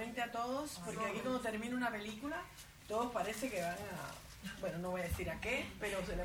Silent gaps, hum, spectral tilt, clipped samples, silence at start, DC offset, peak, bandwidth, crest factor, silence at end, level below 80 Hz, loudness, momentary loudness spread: none; none; -4.5 dB/octave; under 0.1%; 0 s; under 0.1%; -26 dBFS; over 20 kHz; 16 dB; 0 s; -56 dBFS; -41 LUFS; 8 LU